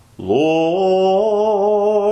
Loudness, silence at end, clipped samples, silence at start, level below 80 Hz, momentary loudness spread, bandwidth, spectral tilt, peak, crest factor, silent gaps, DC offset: -16 LUFS; 0 s; under 0.1%; 0.2 s; -56 dBFS; 2 LU; 8.2 kHz; -6.5 dB/octave; -4 dBFS; 12 dB; none; under 0.1%